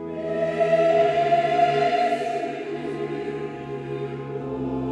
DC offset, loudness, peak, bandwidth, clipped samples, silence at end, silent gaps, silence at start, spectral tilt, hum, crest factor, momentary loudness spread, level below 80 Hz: under 0.1%; -24 LUFS; -8 dBFS; 9.8 kHz; under 0.1%; 0 s; none; 0 s; -6.5 dB/octave; none; 14 dB; 12 LU; -56 dBFS